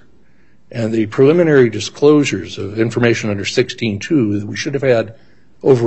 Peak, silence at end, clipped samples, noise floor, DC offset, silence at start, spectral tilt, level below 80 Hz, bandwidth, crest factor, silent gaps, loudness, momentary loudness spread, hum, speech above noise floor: 0 dBFS; 0 s; under 0.1%; -54 dBFS; 0.7%; 0.75 s; -6 dB/octave; -54 dBFS; 8.4 kHz; 14 dB; none; -15 LUFS; 10 LU; none; 39 dB